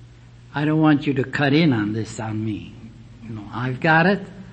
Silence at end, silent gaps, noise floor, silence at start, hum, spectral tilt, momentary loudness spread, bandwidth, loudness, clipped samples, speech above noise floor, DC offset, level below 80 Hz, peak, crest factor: 0 s; none; -45 dBFS; 0 s; none; -7 dB/octave; 17 LU; 8.6 kHz; -20 LUFS; under 0.1%; 25 dB; under 0.1%; -52 dBFS; -4 dBFS; 16 dB